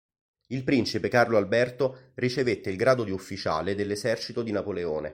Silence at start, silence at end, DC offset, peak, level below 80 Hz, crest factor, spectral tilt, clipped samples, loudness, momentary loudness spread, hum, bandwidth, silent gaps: 0.5 s; 0 s; under 0.1%; -6 dBFS; -60 dBFS; 20 dB; -5.5 dB/octave; under 0.1%; -27 LUFS; 8 LU; none; 16 kHz; none